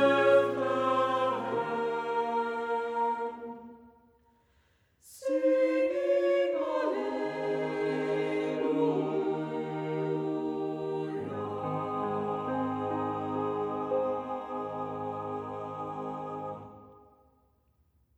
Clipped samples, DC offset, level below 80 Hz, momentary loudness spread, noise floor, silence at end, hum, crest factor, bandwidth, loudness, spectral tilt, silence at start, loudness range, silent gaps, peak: under 0.1%; under 0.1%; -72 dBFS; 11 LU; -69 dBFS; 1.2 s; none; 18 dB; 12 kHz; -31 LUFS; -7 dB/octave; 0 s; 6 LU; none; -12 dBFS